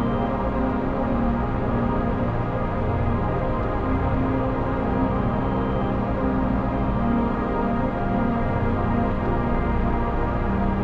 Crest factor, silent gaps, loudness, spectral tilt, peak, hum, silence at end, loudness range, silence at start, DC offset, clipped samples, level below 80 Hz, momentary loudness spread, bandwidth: 12 dB; none; -24 LUFS; -10 dB/octave; -10 dBFS; none; 0 s; 1 LU; 0 s; under 0.1%; under 0.1%; -28 dBFS; 2 LU; 5.6 kHz